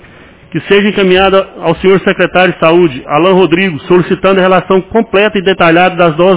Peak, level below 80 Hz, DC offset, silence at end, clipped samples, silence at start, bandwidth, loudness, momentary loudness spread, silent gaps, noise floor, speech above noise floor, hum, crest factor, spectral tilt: 0 dBFS; -38 dBFS; under 0.1%; 0 s; 1%; 0.5 s; 4 kHz; -8 LUFS; 4 LU; none; -36 dBFS; 28 dB; none; 8 dB; -10 dB/octave